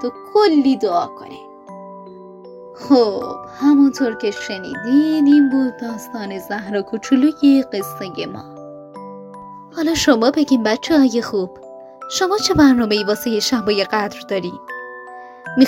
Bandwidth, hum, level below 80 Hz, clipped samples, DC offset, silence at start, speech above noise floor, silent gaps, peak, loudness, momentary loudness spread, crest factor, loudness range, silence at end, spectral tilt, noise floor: 16 kHz; none; -50 dBFS; under 0.1%; under 0.1%; 0 s; 21 dB; none; 0 dBFS; -17 LUFS; 23 LU; 16 dB; 4 LU; 0 s; -4.5 dB/octave; -37 dBFS